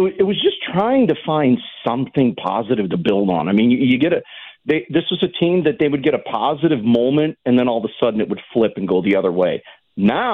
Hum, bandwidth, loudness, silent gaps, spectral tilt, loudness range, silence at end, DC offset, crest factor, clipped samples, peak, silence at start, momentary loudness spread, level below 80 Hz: none; 4.2 kHz; -18 LUFS; none; -9 dB/octave; 1 LU; 0 s; under 0.1%; 12 dB; under 0.1%; -4 dBFS; 0 s; 6 LU; -56 dBFS